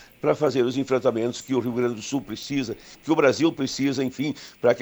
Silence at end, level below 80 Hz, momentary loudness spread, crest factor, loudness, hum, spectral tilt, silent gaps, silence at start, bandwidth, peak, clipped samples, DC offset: 0 s; -60 dBFS; 9 LU; 18 dB; -24 LUFS; none; -5.5 dB/octave; none; 0 s; over 20 kHz; -6 dBFS; under 0.1%; under 0.1%